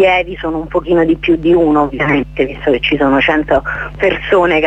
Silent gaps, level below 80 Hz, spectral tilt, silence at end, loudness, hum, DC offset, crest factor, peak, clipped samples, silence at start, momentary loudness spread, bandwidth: none; -32 dBFS; -7 dB/octave; 0 s; -13 LUFS; none; under 0.1%; 12 dB; 0 dBFS; under 0.1%; 0 s; 7 LU; 7.8 kHz